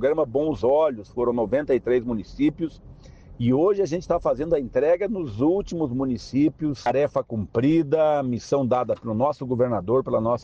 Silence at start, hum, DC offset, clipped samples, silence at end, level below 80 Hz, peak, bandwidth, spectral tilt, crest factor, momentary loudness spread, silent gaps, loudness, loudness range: 0 s; none; under 0.1%; under 0.1%; 0 s; -48 dBFS; -10 dBFS; 7.8 kHz; -8 dB/octave; 14 dB; 6 LU; none; -23 LUFS; 1 LU